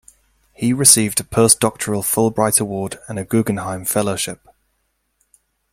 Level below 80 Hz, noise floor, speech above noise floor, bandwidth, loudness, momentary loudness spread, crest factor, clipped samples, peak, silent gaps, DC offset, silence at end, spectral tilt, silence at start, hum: -52 dBFS; -69 dBFS; 51 dB; 16.5 kHz; -16 LUFS; 15 LU; 20 dB; under 0.1%; 0 dBFS; none; under 0.1%; 1.4 s; -3.5 dB/octave; 0.6 s; none